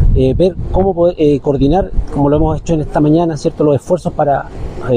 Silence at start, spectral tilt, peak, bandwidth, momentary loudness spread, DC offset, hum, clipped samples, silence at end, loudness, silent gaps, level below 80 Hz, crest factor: 0 s; -8.5 dB/octave; -2 dBFS; 10 kHz; 5 LU; under 0.1%; none; under 0.1%; 0 s; -13 LUFS; none; -20 dBFS; 10 dB